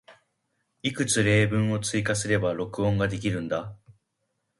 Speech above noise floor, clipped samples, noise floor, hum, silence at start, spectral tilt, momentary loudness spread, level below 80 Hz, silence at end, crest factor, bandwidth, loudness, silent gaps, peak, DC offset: 53 dB; under 0.1%; -78 dBFS; none; 0.1 s; -5 dB/octave; 10 LU; -50 dBFS; 0.85 s; 18 dB; 11.5 kHz; -26 LUFS; none; -10 dBFS; under 0.1%